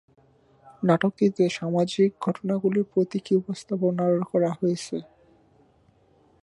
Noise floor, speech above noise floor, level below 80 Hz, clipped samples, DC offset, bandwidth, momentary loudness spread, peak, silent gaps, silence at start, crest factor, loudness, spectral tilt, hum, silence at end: -61 dBFS; 37 dB; -68 dBFS; under 0.1%; under 0.1%; 11.5 kHz; 6 LU; -6 dBFS; none; 0.65 s; 20 dB; -25 LUFS; -7 dB/octave; none; 1.4 s